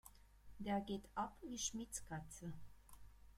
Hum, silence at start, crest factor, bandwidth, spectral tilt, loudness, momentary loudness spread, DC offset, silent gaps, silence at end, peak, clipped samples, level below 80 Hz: none; 0.05 s; 20 dB; 16 kHz; -3.5 dB/octave; -47 LUFS; 22 LU; under 0.1%; none; 0 s; -28 dBFS; under 0.1%; -64 dBFS